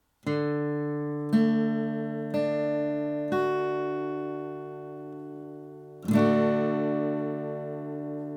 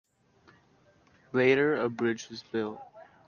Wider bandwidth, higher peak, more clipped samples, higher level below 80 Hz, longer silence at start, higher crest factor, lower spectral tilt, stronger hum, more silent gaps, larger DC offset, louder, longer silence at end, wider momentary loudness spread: first, 13 kHz vs 7 kHz; about the same, -10 dBFS vs -10 dBFS; neither; about the same, -72 dBFS vs -74 dBFS; second, 0.25 s vs 1.35 s; about the same, 18 dB vs 22 dB; first, -8 dB/octave vs -6 dB/octave; neither; neither; neither; about the same, -28 LUFS vs -29 LUFS; second, 0 s vs 0.25 s; about the same, 16 LU vs 14 LU